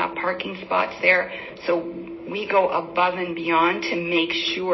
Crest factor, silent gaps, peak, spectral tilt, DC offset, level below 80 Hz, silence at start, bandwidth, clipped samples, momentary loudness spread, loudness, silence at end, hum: 18 dB; none; -4 dBFS; -5 dB/octave; under 0.1%; -60 dBFS; 0 s; 6 kHz; under 0.1%; 12 LU; -22 LUFS; 0 s; none